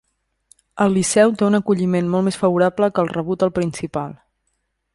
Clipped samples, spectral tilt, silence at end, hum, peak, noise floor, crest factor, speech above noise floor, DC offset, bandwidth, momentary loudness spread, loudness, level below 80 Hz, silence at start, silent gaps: under 0.1%; -6 dB/octave; 0.8 s; none; -2 dBFS; -71 dBFS; 18 dB; 54 dB; under 0.1%; 11.5 kHz; 10 LU; -18 LUFS; -54 dBFS; 0.75 s; none